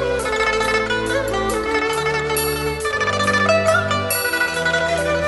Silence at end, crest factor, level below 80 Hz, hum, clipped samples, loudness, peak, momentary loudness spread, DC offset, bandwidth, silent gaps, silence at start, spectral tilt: 0 s; 14 dB; -38 dBFS; none; under 0.1%; -18 LUFS; -4 dBFS; 5 LU; under 0.1%; 12 kHz; none; 0 s; -3.5 dB/octave